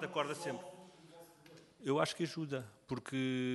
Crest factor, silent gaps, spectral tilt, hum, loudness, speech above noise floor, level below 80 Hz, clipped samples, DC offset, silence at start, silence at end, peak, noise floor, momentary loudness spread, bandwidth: 24 dB; none; -5 dB/octave; none; -39 LUFS; 23 dB; -78 dBFS; under 0.1%; under 0.1%; 0 s; 0 s; -16 dBFS; -61 dBFS; 23 LU; 12 kHz